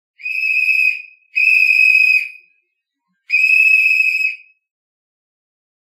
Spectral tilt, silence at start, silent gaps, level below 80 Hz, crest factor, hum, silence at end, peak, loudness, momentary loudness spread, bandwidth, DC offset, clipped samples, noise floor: 7.5 dB/octave; 0.25 s; none; under -90 dBFS; 14 dB; none; 1.6 s; -2 dBFS; -11 LUFS; 13 LU; 15.5 kHz; under 0.1%; under 0.1%; -73 dBFS